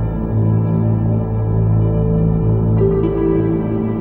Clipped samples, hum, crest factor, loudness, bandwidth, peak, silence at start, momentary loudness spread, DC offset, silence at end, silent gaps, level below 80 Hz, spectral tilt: under 0.1%; none; 12 dB; -16 LUFS; 3.2 kHz; -4 dBFS; 0 s; 3 LU; under 0.1%; 0 s; none; -26 dBFS; -14 dB/octave